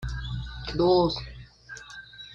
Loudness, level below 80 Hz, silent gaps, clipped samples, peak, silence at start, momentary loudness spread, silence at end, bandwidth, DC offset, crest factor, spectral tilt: -26 LUFS; -42 dBFS; none; under 0.1%; -12 dBFS; 0 s; 22 LU; 0 s; 7.6 kHz; under 0.1%; 18 dB; -6.5 dB/octave